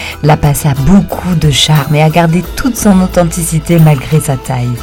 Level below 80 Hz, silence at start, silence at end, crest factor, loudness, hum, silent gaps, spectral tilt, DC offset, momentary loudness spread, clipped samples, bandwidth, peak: -24 dBFS; 0 s; 0 s; 8 dB; -9 LUFS; none; none; -5.5 dB/octave; 0.4%; 6 LU; 3%; 17.5 kHz; 0 dBFS